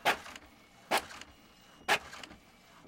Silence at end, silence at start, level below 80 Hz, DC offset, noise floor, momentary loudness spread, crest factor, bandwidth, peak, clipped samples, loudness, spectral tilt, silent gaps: 0.5 s; 0.05 s; -66 dBFS; under 0.1%; -59 dBFS; 20 LU; 22 dB; 16.5 kHz; -14 dBFS; under 0.1%; -33 LUFS; -1.5 dB/octave; none